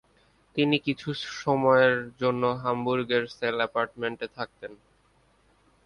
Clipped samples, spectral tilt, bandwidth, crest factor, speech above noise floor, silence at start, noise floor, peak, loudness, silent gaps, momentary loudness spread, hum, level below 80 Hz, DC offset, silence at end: under 0.1%; -6 dB/octave; 10.5 kHz; 20 dB; 38 dB; 0.55 s; -64 dBFS; -8 dBFS; -26 LUFS; none; 14 LU; none; -64 dBFS; under 0.1%; 1.1 s